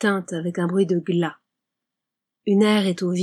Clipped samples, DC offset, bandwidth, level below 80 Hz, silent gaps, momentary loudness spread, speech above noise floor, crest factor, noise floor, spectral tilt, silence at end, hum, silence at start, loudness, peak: under 0.1%; under 0.1%; 12.5 kHz; -78 dBFS; none; 10 LU; 64 dB; 16 dB; -85 dBFS; -6.5 dB/octave; 0 s; none; 0 s; -22 LUFS; -6 dBFS